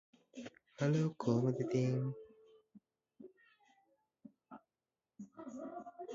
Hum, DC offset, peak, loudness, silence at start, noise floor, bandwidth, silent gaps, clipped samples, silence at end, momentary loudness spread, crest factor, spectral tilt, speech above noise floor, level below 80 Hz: none; under 0.1%; -22 dBFS; -37 LUFS; 0.35 s; under -90 dBFS; 7.6 kHz; none; under 0.1%; 0 s; 25 LU; 20 dB; -8.5 dB/octave; over 55 dB; -80 dBFS